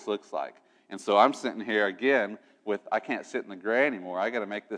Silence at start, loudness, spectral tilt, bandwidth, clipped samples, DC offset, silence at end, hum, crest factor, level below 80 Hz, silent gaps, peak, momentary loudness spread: 0 s; -28 LUFS; -4 dB/octave; 10.5 kHz; under 0.1%; under 0.1%; 0 s; none; 22 dB; -90 dBFS; none; -6 dBFS; 13 LU